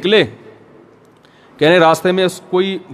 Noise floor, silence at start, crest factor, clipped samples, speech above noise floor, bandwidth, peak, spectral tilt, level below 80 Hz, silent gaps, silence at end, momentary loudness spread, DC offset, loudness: -47 dBFS; 0 s; 16 dB; under 0.1%; 34 dB; 15 kHz; 0 dBFS; -5 dB/octave; -62 dBFS; none; 0 s; 7 LU; under 0.1%; -14 LUFS